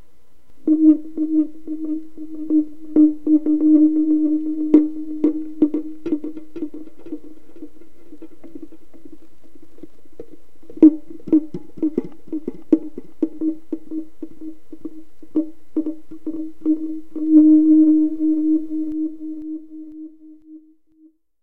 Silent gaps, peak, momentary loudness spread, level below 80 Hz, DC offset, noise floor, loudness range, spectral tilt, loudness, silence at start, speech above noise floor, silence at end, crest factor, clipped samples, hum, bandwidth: none; 0 dBFS; 22 LU; -60 dBFS; 4%; -56 dBFS; 11 LU; -10 dB/octave; -19 LUFS; 0 s; 38 dB; 0 s; 20 dB; under 0.1%; none; 2.2 kHz